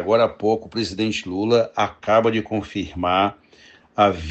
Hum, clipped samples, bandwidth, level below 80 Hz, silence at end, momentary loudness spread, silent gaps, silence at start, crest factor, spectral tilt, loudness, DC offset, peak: none; under 0.1%; 8.4 kHz; -52 dBFS; 0 s; 8 LU; none; 0 s; 18 dB; -5.5 dB/octave; -21 LUFS; under 0.1%; -2 dBFS